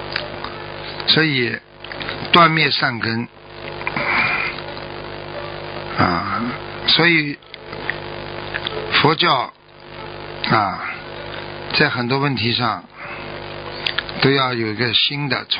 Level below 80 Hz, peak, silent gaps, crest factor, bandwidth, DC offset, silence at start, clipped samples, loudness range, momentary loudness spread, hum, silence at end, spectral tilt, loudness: -48 dBFS; 0 dBFS; none; 20 dB; 5.4 kHz; under 0.1%; 0 s; under 0.1%; 4 LU; 16 LU; none; 0 s; -7.5 dB/octave; -18 LUFS